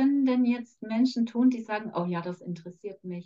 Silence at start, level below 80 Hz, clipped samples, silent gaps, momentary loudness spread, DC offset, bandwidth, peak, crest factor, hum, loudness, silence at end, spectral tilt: 0 s; -82 dBFS; under 0.1%; none; 15 LU; under 0.1%; 7.4 kHz; -14 dBFS; 14 dB; none; -28 LUFS; 0.05 s; -7.5 dB/octave